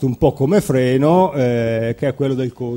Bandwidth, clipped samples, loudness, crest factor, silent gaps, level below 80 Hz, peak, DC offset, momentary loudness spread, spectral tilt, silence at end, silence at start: 16.5 kHz; under 0.1%; -17 LUFS; 14 dB; none; -42 dBFS; -2 dBFS; under 0.1%; 6 LU; -7.5 dB/octave; 0 s; 0 s